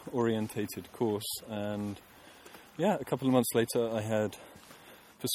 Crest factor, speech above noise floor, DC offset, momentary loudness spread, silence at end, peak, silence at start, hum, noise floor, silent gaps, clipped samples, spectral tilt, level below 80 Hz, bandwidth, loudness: 22 dB; 23 dB; under 0.1%; 23 LU; 0 s; -12 dBFS; 0 s; none; -54 dBFS; none; under 0.1%; -5 dB/octave; -68 dBFS; 17.5 kHz; -32 LUFS